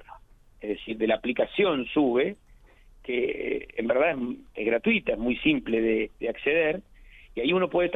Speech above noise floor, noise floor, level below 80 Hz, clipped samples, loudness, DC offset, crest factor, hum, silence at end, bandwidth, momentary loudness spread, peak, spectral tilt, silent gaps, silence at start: 28 dB; -54 dBFS; -52 dBFS; under 0.1%; -26 LUFS; under 0.1%; 18 dB; none; 0 s; 4 kHz; 10 LU; -10 dBFS; -7.5 dB/octave; none; 0 s